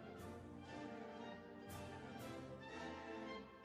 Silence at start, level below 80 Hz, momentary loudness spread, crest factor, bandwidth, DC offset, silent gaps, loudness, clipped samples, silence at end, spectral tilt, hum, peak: 0 s; -72 dBFS; 4 LU; 14 dB; 15.5 kHz; under 0.1%; none; -53 LUFS; under 0.1%; 0 s; -5.5 dB/octave; none; -38 dBFS